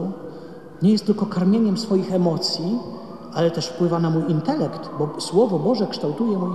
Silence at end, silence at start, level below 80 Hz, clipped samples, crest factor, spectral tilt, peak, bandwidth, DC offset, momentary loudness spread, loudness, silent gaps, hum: 0 s; 0 s; -62 dBFS; under 0.1%; 16 dB; -7 dB/octave; -6 dBFS; 12 kHz; 0.4%; 12 LU; -21 LUFS; none; none